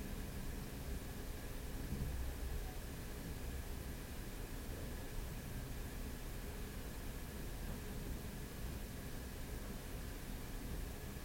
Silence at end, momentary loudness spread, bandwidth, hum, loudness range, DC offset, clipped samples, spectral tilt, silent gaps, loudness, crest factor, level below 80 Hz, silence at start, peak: 0 s; 3 LU; 16.5 kHz; none; 1 LU; under 0.1%; under 0.1%; -5 dB/octave; none; -48 LUFS; 16 dB; -48 dBFS; 0 s; -30 dBFS